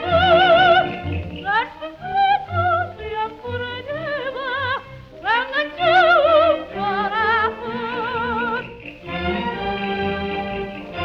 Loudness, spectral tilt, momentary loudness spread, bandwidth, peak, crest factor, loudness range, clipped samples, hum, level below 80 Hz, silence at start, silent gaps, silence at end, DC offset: -20 LUFS; -6.5 dB/octave; 14 LU; 6.8 kHz; -4 dBFS; 16 dB; 6 LU; under 0.1%; none; -44 dBFS; 0 s; none; 0 s; under 0.1%